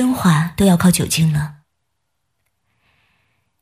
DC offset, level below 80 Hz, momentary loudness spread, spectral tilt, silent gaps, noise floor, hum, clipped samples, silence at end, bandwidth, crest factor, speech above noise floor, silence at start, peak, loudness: under 0.1%; -42 dBFS; 8 LU; -5.5 dB/octave; none; -74 dBFS; none; under 0.1%; 2.1 s; 16 kHz; 16 dB; 59 dB; 0 s; -2 dBFS; -15 LUFS